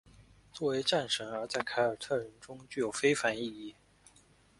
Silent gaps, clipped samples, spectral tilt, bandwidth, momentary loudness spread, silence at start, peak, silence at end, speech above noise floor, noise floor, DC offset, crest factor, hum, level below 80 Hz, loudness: none; under 0.1%; -3.5 dB/octave; 11.5 kHz; 18 LU; 0.2 s; -14 dBFS; 0.85 s; 30 dB; -64 dBFS; under 0.1%; 20 dB; none; -68 dBFS; -33 LUFS